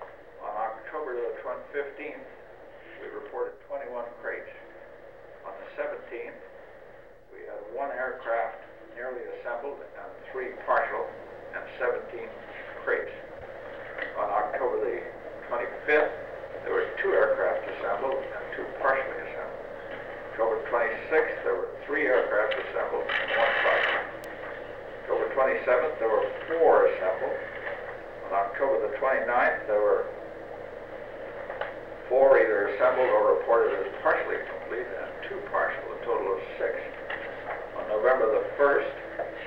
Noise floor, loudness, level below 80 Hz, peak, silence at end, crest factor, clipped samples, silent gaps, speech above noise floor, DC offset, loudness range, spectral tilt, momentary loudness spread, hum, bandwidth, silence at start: -51 dBFS; -28 LUFS; -58 dBFS; -8 dBFS; 0 s; 20 dB; under 0.1%; none; 24 dB; 0.2%; 12 LU; -6 dB/octave; 17 LU; none; 5.8 kHz; 0 s